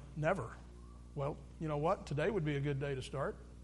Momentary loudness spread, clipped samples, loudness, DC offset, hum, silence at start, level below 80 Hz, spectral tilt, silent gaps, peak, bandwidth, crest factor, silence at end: 13 LU; under 0.1%; -38 LUFS; under 0.1%; 60 Hz at -55 dBFS; 0 s; -54 dBFS; -7 dB/octave; none; -20 dBFS; 11.5 kHz; 18 dB; 0 s